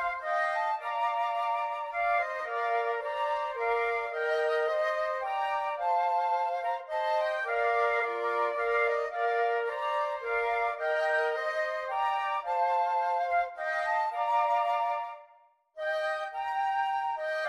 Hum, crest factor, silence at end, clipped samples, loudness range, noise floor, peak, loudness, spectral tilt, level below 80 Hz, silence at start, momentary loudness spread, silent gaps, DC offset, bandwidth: none; 14 dB; 0 s; under 0.1%; 2 LU; -62 dBFS; -16 dBFS; -30 LUFS; -1 dB/octave; -68 dBFS; 0 s; 4 LU; none; under 0.1%; 12 kHz